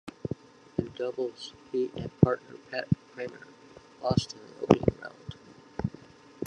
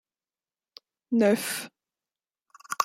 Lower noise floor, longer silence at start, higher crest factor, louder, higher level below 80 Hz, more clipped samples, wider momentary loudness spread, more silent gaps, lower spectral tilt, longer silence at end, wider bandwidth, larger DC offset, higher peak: second, -52 dBFS vs under -90 dBFS; second, 0.05 s vs 1.1 s; first, 30 dB vs 24 dB; second, -31 LUFS vs -26 LUFS; first, -56 dBFS vs -76 dBFS; neither; first, 19 LU vs 16 LU; neither; first, -7 dB/octave vs -4 dB/octave; about the same, 0 s vs 0 s; second, 10 kHz vs 16.5 kHz; neither; first, -2 dBFS vs -8 dBFS